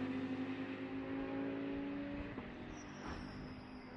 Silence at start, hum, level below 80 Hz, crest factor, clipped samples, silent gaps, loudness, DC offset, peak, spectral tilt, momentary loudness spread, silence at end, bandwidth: 0 s; none; -60 dBFS; 12 dB; under 0.1%; none; -45 LUFS; under 0.1%; -32 dBFS; -6.5 dB/octave; 8 LU; 0 s; 6.6 kHz